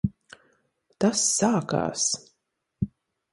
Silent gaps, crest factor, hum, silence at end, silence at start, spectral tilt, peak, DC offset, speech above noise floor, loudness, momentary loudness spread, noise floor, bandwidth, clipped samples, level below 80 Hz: none; 20 dB; none; 0.45 s; 0.05 s; -3.5 dB/octave; -8 dBFS; under 0.1%; 53 dB; -25 LUFS; 12 LU; -77 dBFS; 11.5 kHz; under 0.1%; -54 dBFS